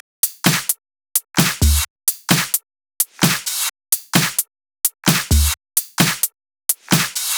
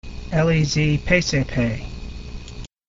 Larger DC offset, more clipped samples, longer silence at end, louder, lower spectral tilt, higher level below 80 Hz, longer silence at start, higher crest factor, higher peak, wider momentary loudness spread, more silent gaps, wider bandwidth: second, under 0.1% vs 0.2%; neither; second, 0 s vs 0.25 s; about the same, -18 LUFS vs -20 LUFS; second, -2.5 dB/octave vs -5.5 dB/octave; first, -28 dBFS vs -34 dBFS; first, 0.25 s vs 0.05 s; about the same, 20 dB vs 18 dB; first, 0 dBFS vs -4 dBFS; second, 6 LU vs 18 LU; first, 1.90-1.96 s vs none; first, over 20 kHz vs 7.8 kHz